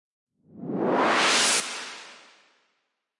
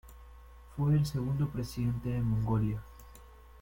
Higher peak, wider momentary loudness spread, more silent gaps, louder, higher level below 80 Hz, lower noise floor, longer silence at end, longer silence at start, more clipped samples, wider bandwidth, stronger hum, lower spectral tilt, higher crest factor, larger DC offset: first, -10 dBFS vs -18 dBFS; first, 20 LU vs 15 LU; neither; first, -22 LUFS vs -32 LUFS; second, -80 dBFS vs -48 dBFS; first, -76 dBFS vs -53 dBFS; first, 1.05 s vs 0 s; first, 0.55 s vs 0.05 s; neither; second, 11.5 kHz vs 17 kHz; neither; second, -1.5 dB/octave vs -8 dB/octave; about the same, 18 dB vs 14 dB; neither